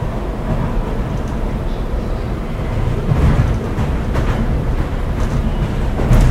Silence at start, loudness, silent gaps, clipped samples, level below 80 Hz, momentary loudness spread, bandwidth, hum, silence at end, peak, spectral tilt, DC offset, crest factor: 0 s; -19 LUFS; none; under 0.1%; -18 dBFS; 8 LU; 13 kHz; none; 0 s; -2 dBFS; -7.5 dB/octave; under 0.1%; 16 dB